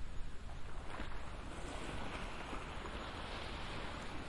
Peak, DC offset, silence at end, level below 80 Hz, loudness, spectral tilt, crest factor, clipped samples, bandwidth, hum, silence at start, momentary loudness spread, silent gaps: -28 dBFS; under 0.1%; 0 s; -48 dBFS; -47 LUFS; -4.5 dB/octave; 14 dB; under 0.1%; 11.5 kHz; none; 0 s; 6 LU; none